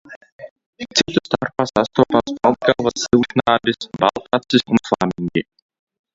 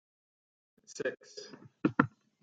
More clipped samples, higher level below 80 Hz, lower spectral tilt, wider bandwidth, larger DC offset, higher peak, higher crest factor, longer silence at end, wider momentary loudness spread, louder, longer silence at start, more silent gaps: neither; first, -50 dBFS vs -76 dBFS; second, -4.5 dB/octave vs -6 dB/octave; second, 7.8 kHz vs 9.2 kHz; neither; first, 0 dBFS vs -8 dBFS; second, 18 dB vs 30 dB; first, 0.75 s vs 0.35 s; second, 7 LU vs 19 LU; first, -18 LUFS vs -34 LUFS; second, 0.1 s vs 0.9 s; first, 0.16-0.21 s, 0.32-0.39 s, 0.51-0.56 s, 0.66-0.73 s vs none